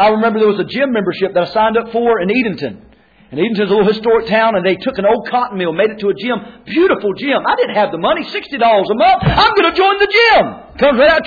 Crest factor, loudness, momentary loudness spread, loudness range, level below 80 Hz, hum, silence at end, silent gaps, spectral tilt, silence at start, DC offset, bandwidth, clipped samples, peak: 12 dB; -13 LUFS; 8 LU; 4 LU; -40 dBFS; none; 0 s; none; -7 dB/octave; 0 s; under 0.1%; 5 kHz; under 0.1%; 0 dBFS